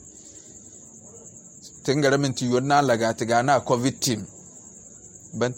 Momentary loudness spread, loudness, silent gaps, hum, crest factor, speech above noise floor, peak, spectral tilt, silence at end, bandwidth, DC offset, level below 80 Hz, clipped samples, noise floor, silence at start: 23 LU; -22 LUFS; none; none; 18 dB; 24 dB; -6 dBFS; -4.5 dB/octave; 0 s; 16.5 kHz; under 0.1%; -60 dBFS; under 0.1%; -46 dBFS; 0.05 s